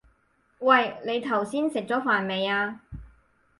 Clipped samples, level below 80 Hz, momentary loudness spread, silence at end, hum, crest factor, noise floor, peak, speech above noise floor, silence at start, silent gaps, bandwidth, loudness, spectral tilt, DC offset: under 0.1%; -56 dBFS; 15 LU; 0.5 s; none; 20 dB; -67 dBFS; -6 dBFS; 42 dB; 0.6 s; none; 11.5 kHz; -25 LUFS; -5 dB/octave; under 0.1%